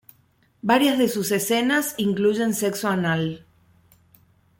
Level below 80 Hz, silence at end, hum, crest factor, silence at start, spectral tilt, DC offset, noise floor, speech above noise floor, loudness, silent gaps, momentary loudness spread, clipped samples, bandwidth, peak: -62 dBFS; 1.2 s; none; 18 dB; 0.65 s; -4.5 dB/octave; under 0.1%; -62 dBFS; 40 dB; -22 LUFS; none; 7 LU; under 0.1%; 17 kHz; -6 dBFS